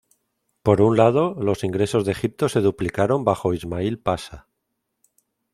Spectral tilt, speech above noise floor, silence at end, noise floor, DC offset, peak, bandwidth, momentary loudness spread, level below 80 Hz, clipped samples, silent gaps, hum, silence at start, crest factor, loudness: -7 dB/octave; 57 dB; 1.15 s; -77 dBFS; under 0.1%; 0 dBFS; 14.5 kHz; 9 LU; -52 dBFS; under 0.1%; none; none; 0.65 s; 20 dB; -21 LUFS